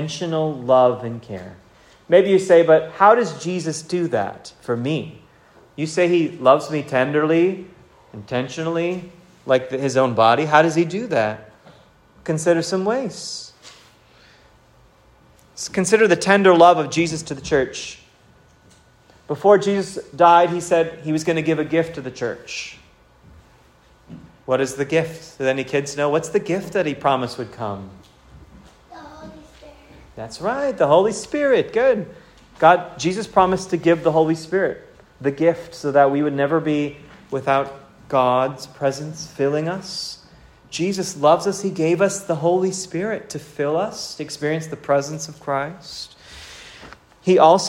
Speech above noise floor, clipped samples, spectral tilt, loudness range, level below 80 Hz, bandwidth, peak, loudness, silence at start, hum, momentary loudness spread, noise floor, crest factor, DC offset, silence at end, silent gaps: 34 dB; under 0.1%; -5 dB/octave; 8 LU; -56 dBFS; 15.5 kHz; 0 dBFS; -19 LUFS; 0 s; none; 17 LU; -53 dBFS; 20 dB; under 0.1%; 0 s; none